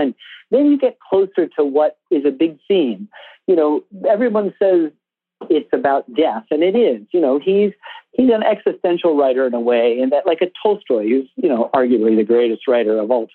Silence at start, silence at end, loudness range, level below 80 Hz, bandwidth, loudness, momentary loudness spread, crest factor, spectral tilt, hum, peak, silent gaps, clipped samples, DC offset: 0 s; 0.1 s; 2 LU; -70 dBFS; 4.3 kHz; -17 LUFS; 5 LU; 14 dB; -9.5 dB/octave; none; -2 dBFS; none; under 0.1%; under 0.1%